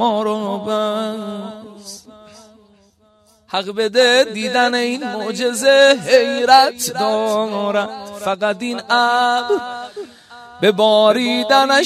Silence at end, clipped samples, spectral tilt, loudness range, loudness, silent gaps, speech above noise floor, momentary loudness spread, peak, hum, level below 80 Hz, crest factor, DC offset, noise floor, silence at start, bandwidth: 0 s; under 0.1%; -3 dB/octave; 10 LU; -16 LUFS; none; 39 dB; 18 LU; 0 dBFS; none; -64 dBFS; 16 dB; under 0.1%; -54 dBFS; 0 s; 15.5 kHz